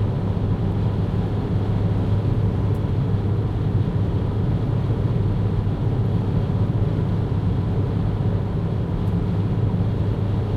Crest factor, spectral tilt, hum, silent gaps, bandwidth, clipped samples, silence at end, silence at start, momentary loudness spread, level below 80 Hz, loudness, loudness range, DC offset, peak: 12 dB; -10 dB/octave; none; none; 5 kHz; under 0.1%; 0 s; 0 s; 2 LU; -30 dBFS; -22 LUFS; 1 LU; under 0.1%; -8 dBFS